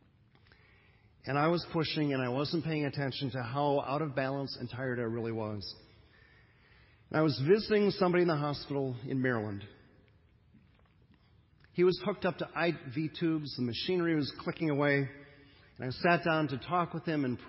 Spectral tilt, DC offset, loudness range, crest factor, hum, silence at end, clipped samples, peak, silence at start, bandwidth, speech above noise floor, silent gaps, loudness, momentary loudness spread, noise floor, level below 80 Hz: -10 dB/octave; under 0.1%; 6 LU; 20 dB; none; 0 s; under 0.1%; -14 dBFS; 1.25 s; 5.8 kHz; 32 dB; none; -32 LUFS; 11 LU; -64 dBFS; -64 dBFS